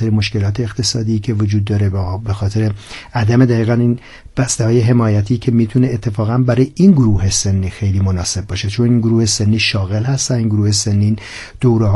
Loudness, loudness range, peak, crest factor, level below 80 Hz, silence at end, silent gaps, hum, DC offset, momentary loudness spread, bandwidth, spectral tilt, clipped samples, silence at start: -15 LUFS; 3 LU; 0 dBFS; 14 dB; -38 dBFS; 0 s; none; none; under 0.1%; 8 LU; 11.5 kHz; -5.5 dB/octave; under 0.1%; 0 s